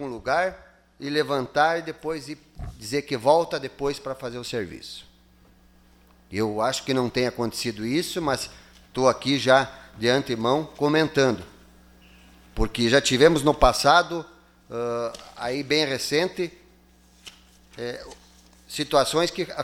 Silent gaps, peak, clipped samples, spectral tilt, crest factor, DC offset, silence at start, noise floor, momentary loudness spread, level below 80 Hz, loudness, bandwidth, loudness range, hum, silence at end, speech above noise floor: none; -2 dBFS; under 0.1%; -4 dB/octave; 22 dB; under 0.1%; 0 s; -56 dBFS; 16 LU; -42 dBFS; -24 LUFS; 17 kHz; 7 LU; none; 0 s; 32 dB